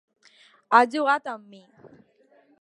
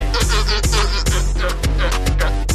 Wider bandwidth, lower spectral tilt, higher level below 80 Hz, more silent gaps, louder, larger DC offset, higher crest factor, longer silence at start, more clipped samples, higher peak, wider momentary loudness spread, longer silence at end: second, 11 kHz vs 14 kHz; about the same, -3.5 dB/octave vs -3.5 dB/octave; second, -84 dBFS vs -18 dBFS; neither; second, -21 LUFS vs -18 LUFS; neither; first, 24 dB vs 12 dB; first, 0.7 s vs 0 s; neither; about the same, -2 dBFS vs -4 dBFS; first, 18 LU vs 3 LU; first, 1.25 s vs 0 s